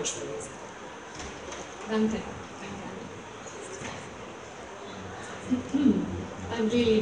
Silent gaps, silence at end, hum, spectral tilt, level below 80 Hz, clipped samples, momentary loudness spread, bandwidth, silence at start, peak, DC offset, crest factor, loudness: none; 0 s; none; -4.5 dB/octave; -56 dBFS; under 0.1%; 16 LU; 10.5 kHz; 0 s; -12 dBFS; under 0.1%; 20 dB; -33 LUFS